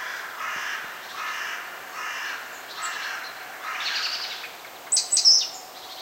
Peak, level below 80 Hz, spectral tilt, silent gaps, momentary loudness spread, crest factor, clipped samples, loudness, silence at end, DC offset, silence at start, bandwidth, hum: -6 dBFS; -76 dBFS; 3 dB/octave; none; 19 LU; 22 dB; under 0.1%; -24 LUFS; 0 s; under 0.1%; 0 s; 16 kHz; none